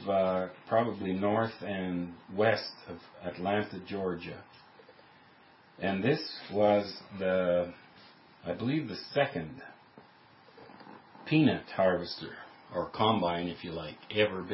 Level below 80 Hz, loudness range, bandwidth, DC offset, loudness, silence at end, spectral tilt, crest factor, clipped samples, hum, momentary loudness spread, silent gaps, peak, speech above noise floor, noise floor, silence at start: -62 dBFS; 6 LU; 5.8 kHz; under 0.1%; -31 LUFS; 0 s; -9.5 dB/octave; 18 dB; under 0.1%; none; 17 LU; none; -14 dBFS; 28 dB; -59 dBFS; 0 s